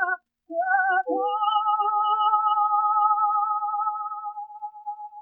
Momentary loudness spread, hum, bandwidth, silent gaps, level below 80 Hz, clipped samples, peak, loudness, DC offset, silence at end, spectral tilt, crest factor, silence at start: 15 LU; none; 3.3 kHz; none; -86 dBFS; under 0.1%; -10 dBFS; -23 LUFS; under 0.1%; 0 s; -3 dB/octave; 14 dB; 0 s